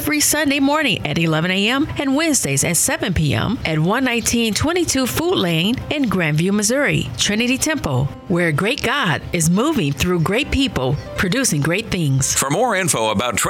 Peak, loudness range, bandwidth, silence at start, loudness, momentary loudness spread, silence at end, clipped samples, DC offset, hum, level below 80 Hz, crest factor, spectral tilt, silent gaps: -2 dBFS; 1 LU; 19.5 kHz; 0 s; -17 LUFS; 3 LU; 0 s; under 0.1%; under 0.1%; none; -38 dBFS; 16 dB; -4 dB/octave; none